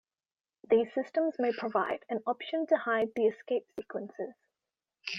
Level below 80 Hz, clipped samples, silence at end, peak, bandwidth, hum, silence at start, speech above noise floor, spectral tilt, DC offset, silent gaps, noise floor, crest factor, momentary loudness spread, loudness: -78 dBFS; under 0.1%; 0 s; -14 dBFS; 6.6 kHz; none; 0.7 s; over 59 dB; -5.5 dB/octave; under 0.1%; none; under -90 dBFS; 18 dB; 13 LU; -31 LUFS